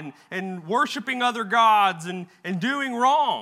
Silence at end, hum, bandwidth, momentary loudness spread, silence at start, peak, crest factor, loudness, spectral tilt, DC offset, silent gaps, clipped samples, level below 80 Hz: 0 s; none; 15 kHz; 14 LU; 0 s; -8 dBFS; 16 dB; -22 LUFS; -4 dB/octave; under 0.1%; none; under 0.1%; -86 dBFS